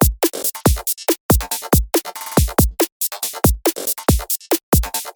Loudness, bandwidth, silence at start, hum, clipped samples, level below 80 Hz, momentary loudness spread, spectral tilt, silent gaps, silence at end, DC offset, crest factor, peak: -18 LUFS; over 20 kHz; 0 s; none; under 0.1%; -24 dBFS; 4 LU; -4.5 dB/octave; 1.20-1.29 s, 2.92-3.00 s, 4.63-4.72 s; 0.05 s; under 0.1%; 16 dB; -2 dBFS